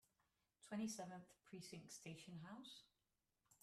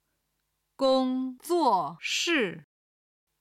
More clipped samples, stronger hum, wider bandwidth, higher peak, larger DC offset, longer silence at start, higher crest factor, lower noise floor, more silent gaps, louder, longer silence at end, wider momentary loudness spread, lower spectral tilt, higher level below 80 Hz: neither; neither; about the same, 14 kHz vs 15 kHz; second, -38 dBFS vs -12 dBFS; neither; second, 0.6 s vs 0.8 s; about the same, 18 dB vs 18 dB; first, under -90 dBFS vs -79 dBFS; neither; second, -55 LUFS vs -27 LUFS; second, 0.05 s vs 0.8 s; first, 12 LU vs 8 LU; first, -4.5 dB/octave vs -3 dB/octave; second, -90 dBFS vs -72 dBFS